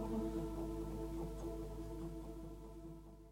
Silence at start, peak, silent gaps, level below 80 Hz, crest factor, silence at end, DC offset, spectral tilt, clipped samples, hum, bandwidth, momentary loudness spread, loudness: 0 s; -30 dBFS; none; -50 dBFS; 16 dB; 0 s; under 0.1%; -7.5 dB/octave; under 0.1%; 50 Hz at -50 dBFS; 16.5 kHz; 11 LU; -47 LUFS